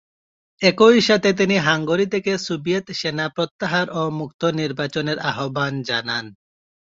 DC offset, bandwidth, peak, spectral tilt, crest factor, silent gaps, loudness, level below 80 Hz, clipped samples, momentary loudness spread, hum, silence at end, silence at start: under 0.1%; 7.8 kHz; -2 dBFS; -5 dB/octave; 20 dB; 3.51-3.59 s, 4.34-4.39 s; -20 LUFS; -60 dBFS; under 0.1%; 10 LU; none; 0.5 s; 0.6 s